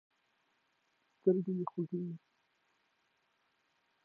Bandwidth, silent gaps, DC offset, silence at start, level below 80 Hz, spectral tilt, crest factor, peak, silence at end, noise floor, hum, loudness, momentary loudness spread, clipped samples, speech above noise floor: 4.1 kHz; none; under 0.1%; 1.25 s; -90 dBFS; -11.5 dB/octave; 24 dB; -16 dBFS; 1.9 s; -78 dBFS; none; -36 LUFS; 12 LU; under 0.1%; 43 dB